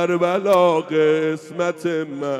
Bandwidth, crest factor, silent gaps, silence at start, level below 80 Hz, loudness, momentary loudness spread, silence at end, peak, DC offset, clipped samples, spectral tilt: 15.5 kHz; 14 dB; none; 0 s; -70 dBFS; -19 LUFS; 8 LU; 0 s; -4 dBFS; under 0.1%; under 0.1%; -6 dB/octave